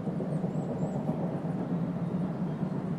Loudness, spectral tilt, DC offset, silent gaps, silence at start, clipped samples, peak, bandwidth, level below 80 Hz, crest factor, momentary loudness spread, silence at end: -33 LUFS; -9.5 dB/octave; under 0.1%; none; 0 s; under 0.1%; -18 dBFS; 9.2 kHz; -62 dBFS; 14 dB; 1 LU; 0 s